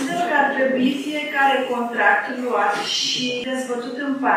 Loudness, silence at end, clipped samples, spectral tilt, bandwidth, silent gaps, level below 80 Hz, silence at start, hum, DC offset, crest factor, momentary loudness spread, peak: -20 LUFS; 0 s; under 0.1%; -2.5 dB/octave; 15.5 kHz; none; -74 dBFS; 0 s; none; under 0.1%; 16 dB; 8 LU; -4 dBFS